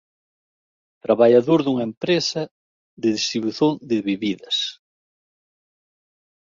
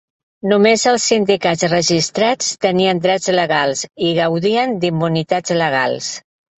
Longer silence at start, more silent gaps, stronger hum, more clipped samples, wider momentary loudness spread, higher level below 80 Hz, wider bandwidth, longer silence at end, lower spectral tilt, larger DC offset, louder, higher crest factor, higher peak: first, 1.1 s vs 0.45 s; first, 1.97-2.01 s, 2.51-2.97 s vs none; neither; neither; first, 11 LU vs 6 LU; second, -66 dBFS vs -56 dBFS; second, 7.6 kHz vs 8.4 kHz; first, 1.75 s vs 0.4 s; about the same, -5 dB/octave vs -4 dB/octave; neither; second, -20 LUFS vs -16 LUFS; first, 20 dB vs 14 dB; about the same, -2 dBFS vs -2 dBFS